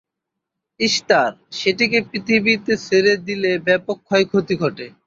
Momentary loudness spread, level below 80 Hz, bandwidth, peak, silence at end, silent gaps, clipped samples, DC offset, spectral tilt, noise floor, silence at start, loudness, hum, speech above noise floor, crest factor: 6 LU; -60 dBFS; 7.8 kHz; -2 dBFS; 0.2 s; none; under 0.1%; under 0.1%; -4 dB/octave; -81 dBFS; 0.8 s; -18 LUFS; none; 63 dB; 18 dB